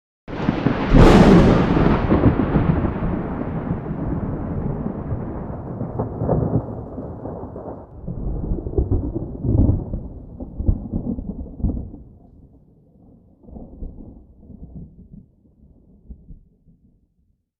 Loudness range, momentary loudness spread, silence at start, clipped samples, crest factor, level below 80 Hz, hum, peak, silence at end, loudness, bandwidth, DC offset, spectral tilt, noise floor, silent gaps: 27 LU; 22 LU; 0.3 s; under 0.1%; 20 dB; -28 dBFS; none; -2 dBFS; 1.25 s; -20 LUFS; 9.8 kHz; under 0.1%; -8.5 dB/octave; -65 dBFS; none